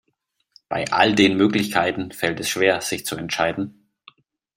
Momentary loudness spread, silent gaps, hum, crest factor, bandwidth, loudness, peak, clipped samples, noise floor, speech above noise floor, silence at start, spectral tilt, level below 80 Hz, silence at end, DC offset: 11 LU; none; none; 20 dB; 16 kHz; -20 LUFS; -2 dBFS; under 0.1%; -72 dBFS; 52 dB; 0.7 s; -4 dB/octave; -58 dBFS; 0.85 s; under 0.1%